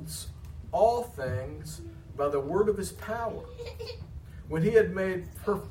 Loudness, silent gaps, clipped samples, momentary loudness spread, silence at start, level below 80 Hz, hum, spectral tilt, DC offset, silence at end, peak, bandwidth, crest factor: -29 LUFS; none; under 0.1%; 18 LU; 0 s; -48 dBFS; none; -6 dB/octave; under 0.1%; 0 s; -10 dBFS; 16 kHz; 20 dB